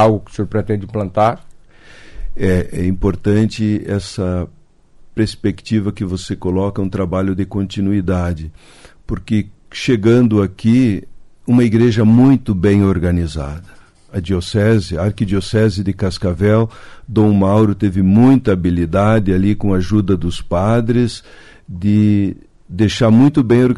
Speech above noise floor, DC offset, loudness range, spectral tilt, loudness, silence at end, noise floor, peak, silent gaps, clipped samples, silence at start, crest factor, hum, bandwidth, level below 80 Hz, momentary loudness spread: 30 dB; under 0.1%; 6 LU; -7.5 dB/octave; -15 LUFS; 0 s; -44 dBFS; -2 dBFS; none; under 0.1%; 0 s; 12 dB; none; 11.5 kHz; -34 dBFS; 12 LU